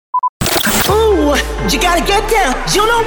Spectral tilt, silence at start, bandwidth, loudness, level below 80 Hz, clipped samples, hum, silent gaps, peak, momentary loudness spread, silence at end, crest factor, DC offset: -3 dB/octave; 0.15 s; over 20 kHz; -13 LUFS; -24 dBFS; under 0.1%; none; 0.29-0.40 s; -2 dBFS; 4 LU; 0 s; 12 dB; under 0.1%